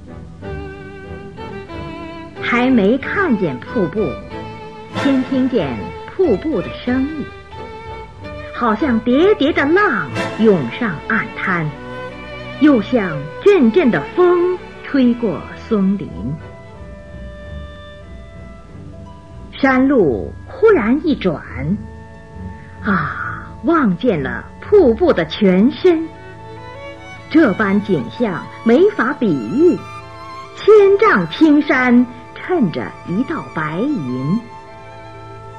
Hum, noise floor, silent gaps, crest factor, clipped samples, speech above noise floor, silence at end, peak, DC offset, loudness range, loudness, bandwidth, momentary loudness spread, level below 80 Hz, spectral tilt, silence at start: none; -35 dBFS; none; 14 dB; under 0.1%; 21 dB; 0 s; -2 dBFS; 0.6%; 7 LU; -16 LUFS; 9.2 kHz; 22 LU; -40 dBFS; -7.5 dB/octave; 0 s